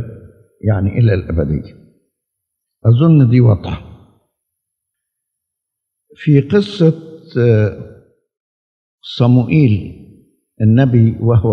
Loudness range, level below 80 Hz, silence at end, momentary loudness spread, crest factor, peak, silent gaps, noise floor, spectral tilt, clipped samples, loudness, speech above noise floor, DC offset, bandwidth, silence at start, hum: 4 LU; -40 dBFS; 0 s; 17 LU; 14 dB; 0 dBFS; 8.40-8.98 s; -79 dBFS; -10 dB/octave; under 0.1%; -13 LUFS; 67 dB; under 0.1%; 5.8 kHz; 0 s; none